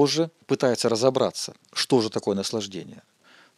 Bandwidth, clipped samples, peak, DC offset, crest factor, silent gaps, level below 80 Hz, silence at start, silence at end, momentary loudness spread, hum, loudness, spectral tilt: 14 kHz; under 0.1%; -4 dBFS; under 0.1%; 20 dB; none; -80 dBFS; 0 s; 0.6 s; 12 LU; none; -24 LUFS; -4.5 dB/octave